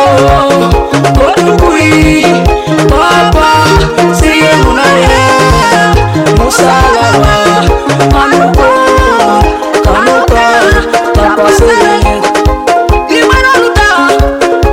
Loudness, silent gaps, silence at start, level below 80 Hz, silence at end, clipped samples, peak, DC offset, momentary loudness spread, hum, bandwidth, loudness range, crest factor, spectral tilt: -6 LUFS; none; 0 s; -16 dBFS; 0 s; 3%; 0 dBFS; under 0.1%; 3 LU; none; 16.5 kHz; 1 LU; 6 dB; -5 dB/octave